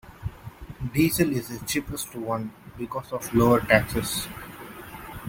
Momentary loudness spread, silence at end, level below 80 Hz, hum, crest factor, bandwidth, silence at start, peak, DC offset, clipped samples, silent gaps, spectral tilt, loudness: 20 LU; 0 s; -46 dBFS; none; 24 dB; 17 kHz; 0.05 s; -2 dBFS; under 0.1%; under 0.1%; none; -5 dB/octave; -25 LUFS